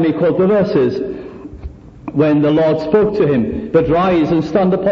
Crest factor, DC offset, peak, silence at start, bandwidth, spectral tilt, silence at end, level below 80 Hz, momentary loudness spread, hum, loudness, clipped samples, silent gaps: 12 dB; under 0.1%; -2 dBFS; 0 s; 6.8 kHz; -9 dB/octave; 0 s; -40 dBFS; 19 LU; none; -14 LUFS; under 0.1%; none